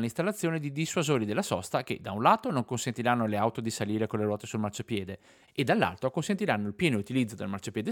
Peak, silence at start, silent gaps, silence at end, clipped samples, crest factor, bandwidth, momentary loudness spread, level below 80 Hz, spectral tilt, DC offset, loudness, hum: -8 dBFS; 0 s; none; 0 s; under 0.1%; 22 dB; 18.5 kHz; 8 LU; -66 dBFS; -5.5 dB/octave; under 0.1%; -30 LUFS; none